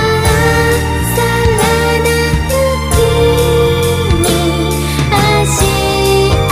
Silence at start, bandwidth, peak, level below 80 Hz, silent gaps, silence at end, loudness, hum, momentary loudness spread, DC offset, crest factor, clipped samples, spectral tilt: 0 s; 15.5 kHz; 0 dBFS; -20 dBFS; none; 0 s; -11 LUFS; none; 3 LU; under 0.1%; 10 dB; under 0.1%; -4.5 dB/octave